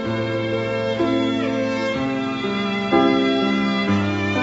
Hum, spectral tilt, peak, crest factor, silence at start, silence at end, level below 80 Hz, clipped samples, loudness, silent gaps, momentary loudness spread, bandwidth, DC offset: none; -6.5 dB/octave; -4 dBFS; 16 dB; 0 s; 0 s; -52 dBFS; under 0.1%; -20 LUFS; none; 5 LU; 8 kHz; under 0.1%